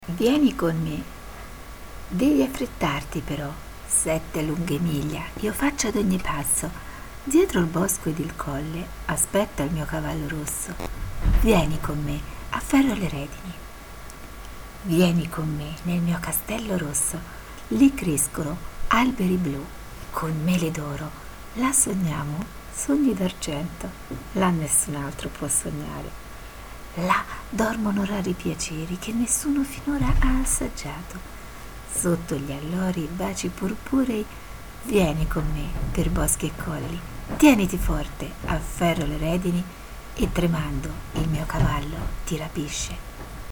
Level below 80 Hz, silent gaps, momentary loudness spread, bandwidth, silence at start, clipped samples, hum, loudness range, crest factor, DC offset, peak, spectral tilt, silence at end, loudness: -34 dBFS; none; 17 LU; over 20 kHz; 0 s; under 0.1%; none; 3 LU; 22 dB; under 0.1%; -4 dBFS; -4.5 dB/octave; 0 s; -25 LUFS